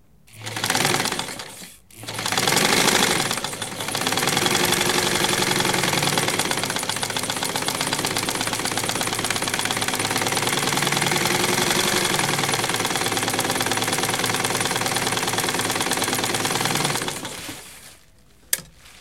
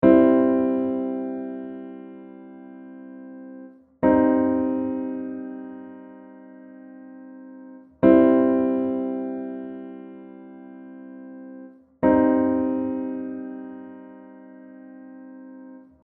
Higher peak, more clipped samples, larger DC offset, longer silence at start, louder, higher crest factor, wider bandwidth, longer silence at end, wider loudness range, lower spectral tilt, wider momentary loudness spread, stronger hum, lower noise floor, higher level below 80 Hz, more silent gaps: about the same, 0 dBFS vs -2 dBFS; neither; first, 0.2% vs under 0.1%; first, 0.35 s vs 0 s; about the same, -21 LUFS vs -22 LUFS; about the same, 22 dB vs 22 dB; first, 17 kHz vs 3.4 kHz; second, 0 s vs 0.25 s; second, 3 LU vs 10 LU; second, -2 dB/octave vs -8 dB/octave; second, 9 LU vs 26 LU; neither; first, -54 dBFS vs -44 dBFS; about the same, -52 dBFS vs -56 dBFS; neither